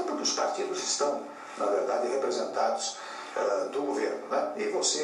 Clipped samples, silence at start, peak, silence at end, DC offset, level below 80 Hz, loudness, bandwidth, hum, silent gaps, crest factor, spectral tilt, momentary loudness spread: under 0.1%; 0 s; -14 dBFS; 0 s; under 0.1%; under -90 dBFS; -30 LUFS; 12 kHz; none; none; 16 dB; -1 dB/octave; 6 LU